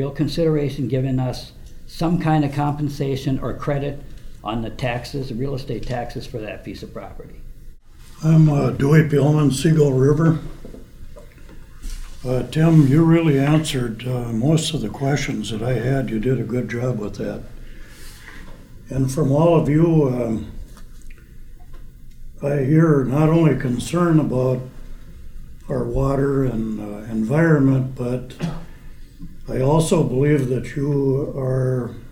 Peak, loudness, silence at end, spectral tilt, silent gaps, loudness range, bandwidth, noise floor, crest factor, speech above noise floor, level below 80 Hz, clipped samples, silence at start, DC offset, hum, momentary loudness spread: -2 dBFS; -20 LUFS; 0 s; -7.5 dB/octave; none; 8 LU; 15 kHz; -40 dBFS; 18 dB; 22 dB; -36 dBFS; under 0.1%; 0 s; under 0.1%; none; 17 LU